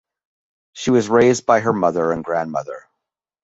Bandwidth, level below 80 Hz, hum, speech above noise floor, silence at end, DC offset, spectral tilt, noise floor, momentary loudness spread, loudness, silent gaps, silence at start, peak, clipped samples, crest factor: 8 kHz; -56 dBFS; none; 64 dB; 0.65 s; under 0.1%; -5.5 dB/octave; -81 dBFS; 12 LU; -18 LUFS; none; 0.75 s; -2 dBFS; under 0.1%; 18 dB